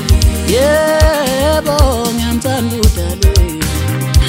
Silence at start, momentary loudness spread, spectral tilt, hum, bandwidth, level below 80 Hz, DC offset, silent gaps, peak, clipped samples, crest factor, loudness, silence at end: 0 s; 5 LU; -5 dB/octave; none; 16.5 kHz; -16 dBFS; under 0.1%; none; 0 dBFS; under 0.1%; 12 dB; -13 LUFS; 0 s